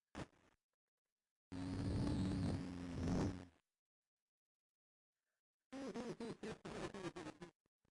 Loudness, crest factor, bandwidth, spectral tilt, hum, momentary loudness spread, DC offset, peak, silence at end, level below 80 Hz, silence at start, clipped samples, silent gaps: -46 LUFS; 14 dB; 11.5 kHz; -7 dB/octave; none; 15 LU; under 0.1%; -34 dBFS; 0.4 s; -60 dBFS; 0.15 s; under 0.1%; 0.63-1.05 s, 1.12-1.17 s, 1.31-1.51 s, 3.79-5.13 s, 5.39-5.71 s